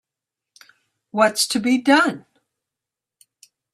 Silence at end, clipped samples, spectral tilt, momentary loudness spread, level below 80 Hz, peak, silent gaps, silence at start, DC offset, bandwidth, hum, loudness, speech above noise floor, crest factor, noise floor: 1.55 s; under 0.1%; -2.5 dB/octave; 12 LU; -70 dBFS; -4 dBFS; none; 1.15 s; under 0.1%; 15 kHz; none; -18 LUFS; 69 dB; 20 dB; -87 dBFS